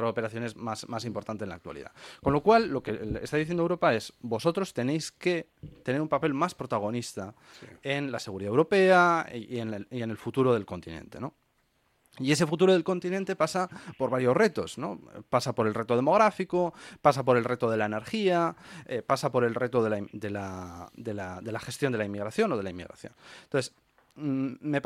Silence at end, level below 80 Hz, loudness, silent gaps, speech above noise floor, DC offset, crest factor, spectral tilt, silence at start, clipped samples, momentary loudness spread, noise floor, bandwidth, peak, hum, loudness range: 0.05 s; -60 dBFS; -28 LUFS; none; 43 dB; under 0.1%; 22 dB; -6 dB/octave; 0 s; under 0.1%; 16 LU; -71 dBFS; 15 kHz; -6 dBFS; none; 6 LU